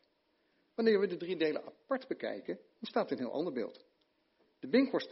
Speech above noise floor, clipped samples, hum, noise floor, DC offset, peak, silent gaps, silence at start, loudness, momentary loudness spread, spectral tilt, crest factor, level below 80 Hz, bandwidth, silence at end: 42 dB; under 0.1%; none; -76 dBFS; under 0.1%; -16 dBFS; none; 0.8 s; -35 LUFS; 14 LU; -4 dB/octave; 20 dB; -84 dBFS; 5.8 kHz; 0 s